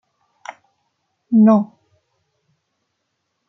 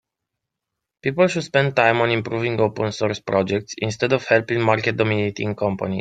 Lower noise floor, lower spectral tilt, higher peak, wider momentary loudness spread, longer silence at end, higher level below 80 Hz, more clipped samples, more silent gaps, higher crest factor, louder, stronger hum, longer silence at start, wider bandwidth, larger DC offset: second, -73 dBFS vs -82 dBFS; first, -9.5 dB/octave vs -5.5 dB/octave; about the same, -4 dBFS vs -2 dBFS; first, 25 LU vs 7 LU; first, 1.85 s vs 0 s; second, -72 dBFS vs -58 dBFS; neither; neither; about the same, 16 dB vs 20 dB; first, -15 LUFS vs -20 LUFS; neither; first, 1.3 s vs 1.05 s; second, 6.2 kHz vs 9.2 kHz; neither